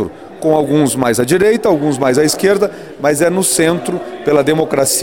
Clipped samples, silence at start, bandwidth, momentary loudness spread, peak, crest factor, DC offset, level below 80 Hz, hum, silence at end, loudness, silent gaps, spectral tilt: under 0.1%; 0 s; 18 kHz; 7 LU; 0 dBFS; 12 dB; 0.3%; -48 dBFS; none; 0 s; -13 LUFS; none; -4.5 dB/octave